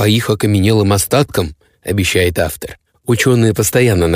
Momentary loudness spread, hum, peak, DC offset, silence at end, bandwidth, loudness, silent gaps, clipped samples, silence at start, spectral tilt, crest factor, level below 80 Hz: 14 LU; none; 0 dBFS; under 0.1%; 0 s; 16 kHz; -14 LUFS; none; under 0.1%; 0 s; -5 dB/octave; 14 dB; -36 dBFS